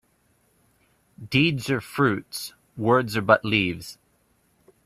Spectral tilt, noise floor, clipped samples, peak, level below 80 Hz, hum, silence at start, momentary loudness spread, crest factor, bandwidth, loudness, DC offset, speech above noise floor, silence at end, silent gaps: -5.5 dB/octave; -65 dBFS; under 0.1%; -2 dBFS; -58 dBFS; none; 1.2 s; 15 LU; 24 dB; 15.5 kHz; -23 LUFS; under 0.1%; 42 dB; 0.9 s; none